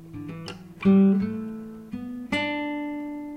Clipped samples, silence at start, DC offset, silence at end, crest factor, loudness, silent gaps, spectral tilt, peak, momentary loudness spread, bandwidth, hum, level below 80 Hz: under 0.1%; 0 s; under 0.1%; 0 s; 16 dB; -25 LUFS; none; -7.5 dB/octave; -10 dBFS; 19 LU; 9 kHz; none; -56 dBFS